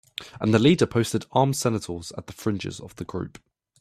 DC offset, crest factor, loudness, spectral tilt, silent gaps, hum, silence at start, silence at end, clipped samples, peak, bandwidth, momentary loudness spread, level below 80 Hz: under 0.1%; 20 dB; -24 LUFS; -5.5 dB/octave; none; none; 0.2 s; 0.5 s; under 0.1%; -4 dBFS; 15 kHz; 17 LU; -56 dBFS